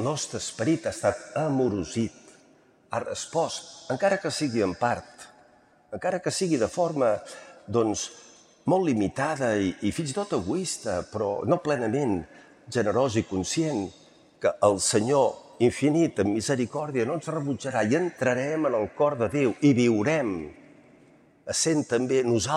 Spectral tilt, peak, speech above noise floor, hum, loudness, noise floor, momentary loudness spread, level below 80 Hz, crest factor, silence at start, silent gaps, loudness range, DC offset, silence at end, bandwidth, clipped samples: -5 dB/octave; -6 dBFS; 33 dB; none; -26 LUFS; -59 dBFS; 9 LU; -60 dBFS; 20 dB; 0 s; none; 4 LU; under 0.1%; 0 s; 14 kHz; under 0.1%